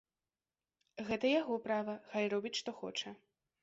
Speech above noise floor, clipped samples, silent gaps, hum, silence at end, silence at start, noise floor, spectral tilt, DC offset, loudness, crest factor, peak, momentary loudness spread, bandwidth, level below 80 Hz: over 53 dB; under 0.1%; none; none; 0.45 s; 0.95 s; under -90 dBFS; -2.5 dB/octave; under 0.1%; -37 LUFS; 18 dB; -22 dBFS; 12 LU; 7.6 kHz; -76 dBFS